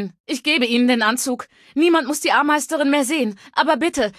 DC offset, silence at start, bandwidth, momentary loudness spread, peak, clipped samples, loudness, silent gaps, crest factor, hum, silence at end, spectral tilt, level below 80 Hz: under 0.1%; 0 s; 14.5 kHz; 8 LU; -4 dBFS; under 0.1%; -18 LUFS; 0.20-0.24 s; 16 dB; none; 0.05 s; -2.5 dB/octave; -60 dBFS